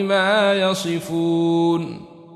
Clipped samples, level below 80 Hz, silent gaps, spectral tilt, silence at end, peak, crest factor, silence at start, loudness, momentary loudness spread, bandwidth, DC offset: under 0.1%; -64 dBFS; none; -5 dB/octave; 0 s; -6 dBFS; 12 dB; 0 s; -19 LUFS; 9 LU; 13.5 kHz; under 0.1%